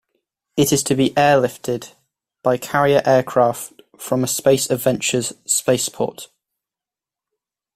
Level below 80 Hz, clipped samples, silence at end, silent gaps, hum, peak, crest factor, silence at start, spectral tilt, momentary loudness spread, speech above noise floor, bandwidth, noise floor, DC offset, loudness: -54 dBFS; under 0.1%; 1.5 s; none; none; -2 dBFS; 18 dB; 0.55 s; -4 dB/octave; 11 LU; 71 dB; 16 kHz; -89 dBFS; under 0.1%; -18 LUFS